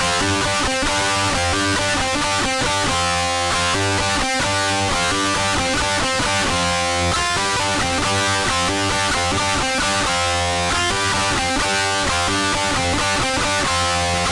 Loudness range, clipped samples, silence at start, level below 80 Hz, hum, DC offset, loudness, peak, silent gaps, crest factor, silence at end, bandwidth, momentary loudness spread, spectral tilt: 0 LU; under 0.1%; 0 s; -36 dBFS; none; under 0.1%; -18 LUFS; -8 dBFS; none; 10 dB; 0 s; 11.5 kHz; 1 LU; -2.5 dB/octave